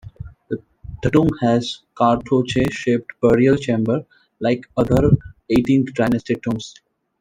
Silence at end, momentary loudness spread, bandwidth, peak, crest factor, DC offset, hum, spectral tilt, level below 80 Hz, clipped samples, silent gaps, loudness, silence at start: 0.5 s; 14 LU; 12 kHz; -2 dBFS; 18 dB; under 0.1%; none; -7 dB/octave; -40 dBFS; under 0.1%; none; -19 LUFS; 0.05 s